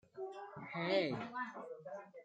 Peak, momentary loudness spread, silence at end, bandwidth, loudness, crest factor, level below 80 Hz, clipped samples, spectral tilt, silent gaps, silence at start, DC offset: -20 dBFS; 14 LU; 0 s; 8.6 kHz; -42 LUFS; 22 dB; -82 dBFS; under 0.1%; -6.5 dB/octave; none; 0.15 s; under 0.1%